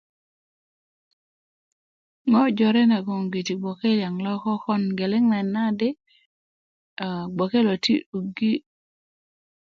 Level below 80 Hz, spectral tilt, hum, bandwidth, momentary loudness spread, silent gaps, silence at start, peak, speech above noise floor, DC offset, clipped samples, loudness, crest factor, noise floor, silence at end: -68 dBFS; -6.5 dB/octave; none; 7.6 kHz; 10 LU; 6.26-6.97 s, 8.06-8.13 s; 2.25 s; -10 dBFS; over 68 dB; under 0.1%; under 0.1%; -23 LUFS; 16 dB; under -90 dBFS; 1.15 s